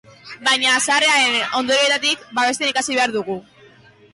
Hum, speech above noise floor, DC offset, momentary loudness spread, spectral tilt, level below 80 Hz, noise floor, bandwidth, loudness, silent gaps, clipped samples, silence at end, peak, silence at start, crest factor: none; 30 dB; under 0.1%; 8 LU; -0.5 dB/octave; -66 dBFS; -48 dBFS; 11.5 kHz; -17 LUFS; none; under 0.1%; 0.75 s; -8 dBFS; 0.25 s; 12 dB